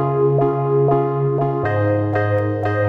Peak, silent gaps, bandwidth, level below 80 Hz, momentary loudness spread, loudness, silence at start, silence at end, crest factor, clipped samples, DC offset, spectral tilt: -6 dBFS; none; 4.6 kHz; -50 dBFS; 3 LU; -18 LUFS; 0 s; 0 s; 12 dB; under 0.1%; under 0.1%; -10.5 dB/octave